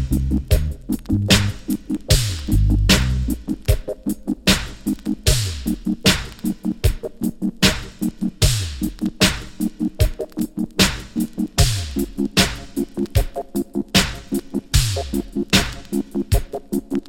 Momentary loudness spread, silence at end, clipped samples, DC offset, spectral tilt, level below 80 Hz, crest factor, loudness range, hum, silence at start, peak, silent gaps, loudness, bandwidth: 9 LU; 0 s; under 0.1%; under 0.1%; -4 dB/octave; -26 dBFS; 20 dB; 2 LU; none; 0 s; 0 dBFS; none; -21 LUFS; 17 kHz